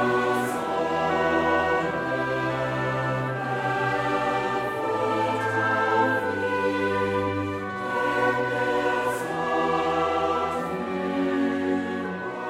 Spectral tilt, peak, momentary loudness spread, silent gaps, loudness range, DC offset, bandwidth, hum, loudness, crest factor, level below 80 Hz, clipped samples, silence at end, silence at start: -6 dB/octave; -10 dBFS; 5 LU; none; 1 LU; under 0.1%; 16 kHz; none; -25 LUFS; 14 dB; -56 dBFS; under 0.1%; 0 s; 0 s